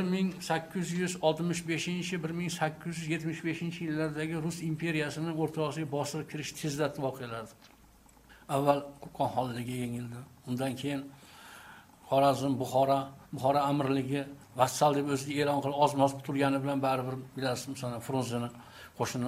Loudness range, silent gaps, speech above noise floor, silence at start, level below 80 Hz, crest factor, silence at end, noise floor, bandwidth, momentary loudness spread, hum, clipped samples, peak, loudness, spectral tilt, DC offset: 6 LU; none; 28 dB; 0 s; -66 dBFS; 22 dB; 0 s; -59 dBFS; 16 kHz; 13 LU; none; under 0.1%; -10 dBFS; -32 LUFS; -5.5 dB/octave; under 0.1%